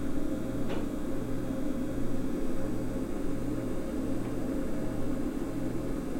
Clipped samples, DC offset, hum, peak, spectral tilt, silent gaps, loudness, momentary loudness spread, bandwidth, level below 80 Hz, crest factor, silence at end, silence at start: under 0.1%; under 0.1%; none; -16 dBFS; -7 dB/octave; none; -35 LUFS; 1 LU; 16 kHz; -40 dBFS; 12 dB; 0 s; 0 s